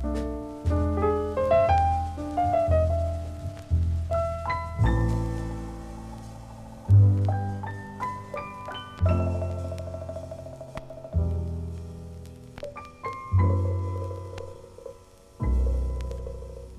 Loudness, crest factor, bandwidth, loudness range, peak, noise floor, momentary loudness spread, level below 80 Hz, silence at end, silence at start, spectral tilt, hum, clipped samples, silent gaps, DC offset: -27 LUFS; 18 dB; 10 kHz; 7 LU; -10 dBFS; -50 dBFS; 18 LU; -36 dBFS; 0 s; 0 s; -8.5 dB/octave; none; under 0.1%; none; under 0.1%